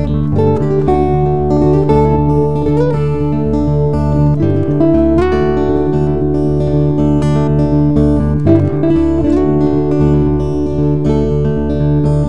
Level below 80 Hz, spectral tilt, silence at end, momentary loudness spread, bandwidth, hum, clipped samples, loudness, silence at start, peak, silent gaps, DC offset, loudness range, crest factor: -24 dBFS; -10 dB/octave; 0 s; 3 LU; 7 kHz; none; under 0.1%; -13 LUFS; 0 s; 0 dBFS; none; 6%; 1 LU; 12 dB